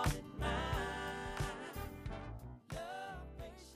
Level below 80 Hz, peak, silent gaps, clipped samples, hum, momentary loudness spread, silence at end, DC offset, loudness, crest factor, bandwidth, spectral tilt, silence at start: -48 dBFS; -24 dBFS; none; under 0.1%; none; 11 LU; 0 s; under 0.1%; -43 LUFS; 18 dB; 15.5 kHz; -5 dB/octave; 0 s